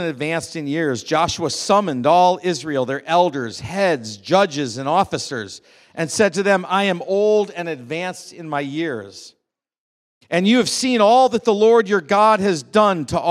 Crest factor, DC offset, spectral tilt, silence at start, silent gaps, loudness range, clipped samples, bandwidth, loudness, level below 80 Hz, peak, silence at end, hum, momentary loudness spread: 18 dB; under 0.1%; -4.5 dB/octave; 0 s; 9.78-10.21 s; 7 LU; under 0.1%; 14 kHz; -18 LUFS; -58 dBFS; 0 dBFS; 0 s; none; 12 LU